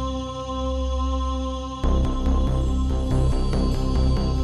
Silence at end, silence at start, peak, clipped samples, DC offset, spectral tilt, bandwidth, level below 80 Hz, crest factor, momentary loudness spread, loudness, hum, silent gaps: 0 s; 0 s; -10 dBFS; under 0.1%; under 0.1%; -7 dB/octave; 11 kHz; -24 dBFS; 12 dB; 5 LU; -25 LUFS; none; none